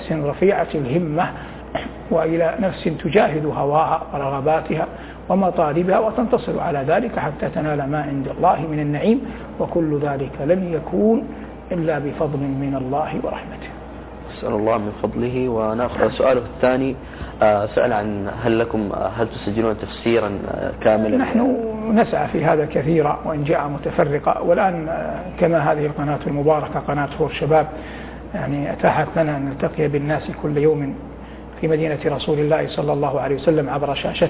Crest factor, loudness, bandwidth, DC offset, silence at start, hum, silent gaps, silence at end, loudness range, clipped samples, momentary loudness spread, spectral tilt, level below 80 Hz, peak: 18 dB; -20 LUFS; 4 kHz; under 0.1%; 0 s; none; none; 0 s; 3 LU; under 0.1%; 10 LU; -11 dB/octave; -40 dBFS; -2 dBFS